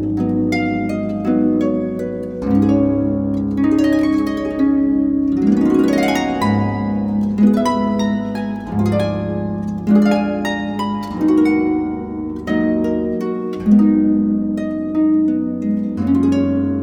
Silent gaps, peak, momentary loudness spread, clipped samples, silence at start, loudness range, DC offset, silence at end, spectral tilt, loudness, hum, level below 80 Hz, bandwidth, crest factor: none; -2 dBFS; 8 LU; under 0.1%; 0 s; 2 LU; under 0.1%; 0 s; -7.5 dB/octave; -17 LUFS; none; -42 dBFS; 12 kHz; 14 dB